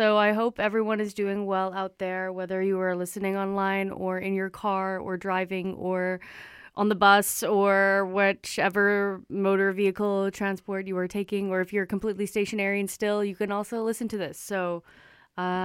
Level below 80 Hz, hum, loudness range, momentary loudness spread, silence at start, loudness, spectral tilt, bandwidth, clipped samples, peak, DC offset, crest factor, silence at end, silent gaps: -64 dBFS; none; 6 LU; 10 LU; 0 s; -26 LUFS; -5 dB/octave; 16.5 kHz; under 0.1%; -6 dBFS; under 0.1%; 20 dB; 0 s; none